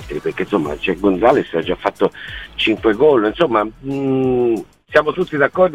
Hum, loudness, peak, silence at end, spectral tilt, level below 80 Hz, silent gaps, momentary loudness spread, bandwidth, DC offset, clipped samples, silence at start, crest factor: none; -17 LUFS; 0 dBFS; 0 s; -6.5 dB/octave; -42 dBFS; none; 9 LU; 12.5 kHz; 0.2%; under 0.1%; 0 s; 16 dB